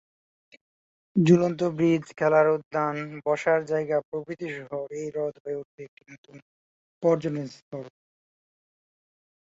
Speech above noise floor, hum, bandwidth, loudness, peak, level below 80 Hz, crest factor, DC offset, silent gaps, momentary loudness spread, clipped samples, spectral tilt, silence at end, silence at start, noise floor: over 64 dB; none; 8 kHz; -26 LUFS; -6 dBFS; -68 dBFS; 20 dB; under 0.1%; 2.65-2.71 s, 4.05-4.12 s, 5.40-5.45 s, 5.65-5.78 s, 5.88-5.97 s, 6.18-6.23 s, 6.42-7.01 s, 7.62-7.71 s; 19 LU; under 0.1%; -7.5 dB/octave; 1.65 s; 1.15 s; under -90 dBFS